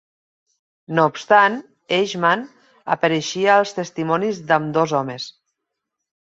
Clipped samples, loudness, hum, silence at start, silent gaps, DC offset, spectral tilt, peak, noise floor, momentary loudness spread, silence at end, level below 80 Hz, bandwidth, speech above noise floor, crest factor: under 0.1%; -19 LUFS; none; 0.9 s; none; under 0.1%; -4.5 dB/octave; -2 dBFS; -80 dBFS; 15 LU; 1.05 s; -66 dBFS; 8 kHz; 61 dB; 18 dB